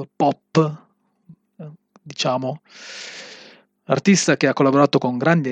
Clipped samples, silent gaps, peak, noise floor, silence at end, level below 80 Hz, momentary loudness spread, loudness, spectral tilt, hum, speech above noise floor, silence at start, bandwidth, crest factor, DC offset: under 0.1%; none; -2 dBFS; -51 dBFS; 0 s; -72 dBFS; 24 LU; -19 LUFS; -5 dB/octave; none; 32 dB; 0 s; 9.4 kHz; 20 dB; under 0.1%